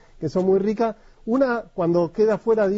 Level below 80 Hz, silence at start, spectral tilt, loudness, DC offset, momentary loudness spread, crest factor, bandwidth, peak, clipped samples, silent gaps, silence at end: -52 dBFS; 0.2 s; -8.5 dB/octave; -22 LUFS; under 0.1%; 6 LU; 12 dB; 7.8 kHz; -8 dBFS; under 0.1%; none; 0 s